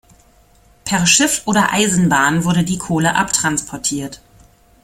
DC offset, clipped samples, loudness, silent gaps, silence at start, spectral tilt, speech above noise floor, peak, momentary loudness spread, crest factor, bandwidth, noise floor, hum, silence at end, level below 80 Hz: under 0.1%; under 0.1%; -15 LUFS; none; 0.85 s; -3 dB/octave; 35 dB; 0 dBFS; 9 LU; 18 dB; 16 kHz; -51 dBFS; none; 0.65 s; -46 dBFS